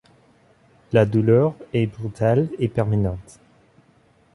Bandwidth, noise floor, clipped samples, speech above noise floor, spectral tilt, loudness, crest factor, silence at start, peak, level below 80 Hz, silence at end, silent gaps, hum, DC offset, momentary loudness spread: 11 kHz; -57 dBFS; under 0.1%; 38 dB; -9 dB/octave; -21 LUFS; 18 dB; 0.9 s; -4 dBFS; -46 dBFS; 1.1 s; none; none; under 0.1%; 8 LU